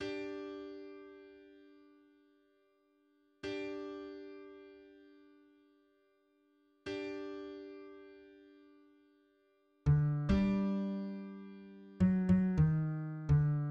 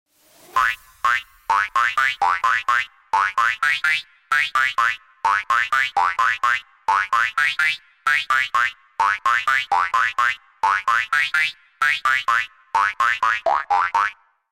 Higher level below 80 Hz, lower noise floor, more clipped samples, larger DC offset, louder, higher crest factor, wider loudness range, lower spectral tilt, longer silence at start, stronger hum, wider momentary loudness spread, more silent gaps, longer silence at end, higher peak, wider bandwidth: first, -52 dBFS vs -60 dBFS; first, -73 dBFS vs -50 dBFS; neither; neither; second, -35 LUFS vs -19 LUFS; about the same, 18 dB vs 14 dB; first, 16 LU vs 1 LU; first, -9 dB/octave vs 0.5 dB/octave; second, 0 s vs 0.55 s; neither; first, 23 LU vs 4 LU; neither; second, 0 s vs 0.4 s; second, -20 dBFS vs -8 dBFS; second, 6.6 kHz vs 16.5 kHz